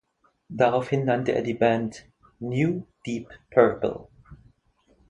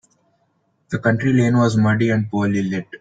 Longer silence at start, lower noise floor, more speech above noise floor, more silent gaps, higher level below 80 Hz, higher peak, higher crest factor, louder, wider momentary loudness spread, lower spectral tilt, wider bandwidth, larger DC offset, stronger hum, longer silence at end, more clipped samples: second, 0.5 s vs 0.9 s; about the same, -64 dBFS vs -65 dBFS; second, 40 dB vs 48 dB; neither; about the same, -58 dBFS vs -54 dBFS; about the same, -4 dBFS vs -4 dBFS; first, 22 dB vs 16 dB; second, -25 LUFS vs -18 LUFS; first, 14 LU vs 6 LU; about the same, -7.5 dB/octave vs -7.5 dB/octave; first, 10.5 kHz vs 9.2 kHz; neither; neither; first, 0.75 s vs 0.05 s; neither